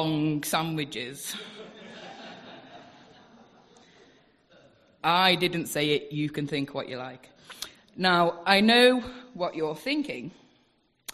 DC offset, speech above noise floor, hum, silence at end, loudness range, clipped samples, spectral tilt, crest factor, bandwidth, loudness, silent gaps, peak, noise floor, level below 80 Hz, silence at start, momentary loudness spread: under 0.1%; 42 dB; none; 0 s; 15 LU; under 0.1%; -4 dB/octave; 24 dB; 14 kHz; -25 LUFS; none; -4 dBFS; -68 dBFS; -66 dBFS; 0 s; 23 LU